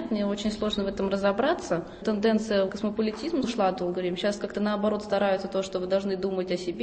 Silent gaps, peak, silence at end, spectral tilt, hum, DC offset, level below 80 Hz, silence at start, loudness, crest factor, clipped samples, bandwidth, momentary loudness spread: none; -12 dBFS; 0 s; -5.5 dB/octave; none; under 0.1%; -54 dBFS; 0 s; -27 LUFS; 14 dB; under 0.1%; 8.8 kHz; 5 LU